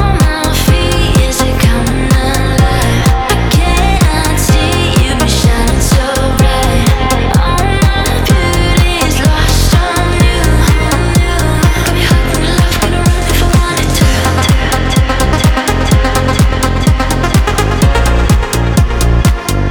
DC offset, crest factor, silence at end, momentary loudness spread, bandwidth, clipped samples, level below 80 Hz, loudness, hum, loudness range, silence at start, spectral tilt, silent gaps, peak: under 0.1%; 10 dB; 0 s; 2 LU; over 20 kHz; under 0.1%; -14 dBFS; -11 LUFS; none; 1 LU; 0 s; -5 dB/octave; none; 0 dBFS